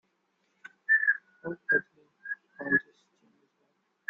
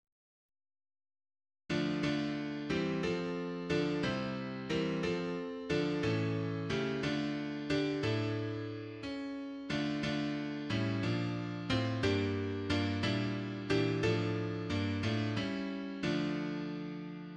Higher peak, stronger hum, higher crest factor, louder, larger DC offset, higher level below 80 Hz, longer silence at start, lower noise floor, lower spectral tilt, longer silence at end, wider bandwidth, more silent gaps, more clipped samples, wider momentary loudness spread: first, -12 dBFS vs -20 dBFS; neither; about the same, 20 dB vs 16 dB; first, -28 LUFS vs -35 LUFS; neither; second, -76 dBFS vs -60 dBFS; second, 0.9 s vs 1.7 s; second, -75 dBFS vs under -90 dBFS; about the same, -7.5 dB/octave vs -6.5 dB/octave; first, 1.3 s vs 0 s; second, 5.2 kHz vs 9.6 kHz; neither; neither; first, 17 LU vs 7 LU